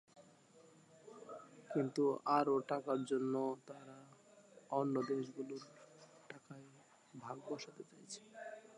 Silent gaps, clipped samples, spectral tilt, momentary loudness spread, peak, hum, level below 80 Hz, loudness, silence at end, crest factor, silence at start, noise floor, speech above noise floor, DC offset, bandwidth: none; under 0.1%; -6 dB/octave; 23 LU; -20 dBFS; none; under -90 dBFS; -40 LUFS; 0 s; 22 dB; 0.15 s; -65 dBFS; 26 dB; under 0.1%; 11.5 kHz